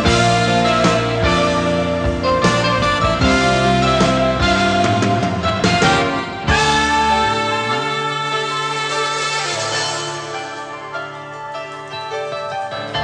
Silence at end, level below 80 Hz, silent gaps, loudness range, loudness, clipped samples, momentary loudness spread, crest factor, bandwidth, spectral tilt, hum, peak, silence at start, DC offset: 0 s; -32 dBFS; none; 7 LU; -16 LUFS; under 0.1%; 13 LU; 14 dB; 10.5 kHz; -4.5 dB/octave; none; -2 dBFS; 0 s; under 0.1%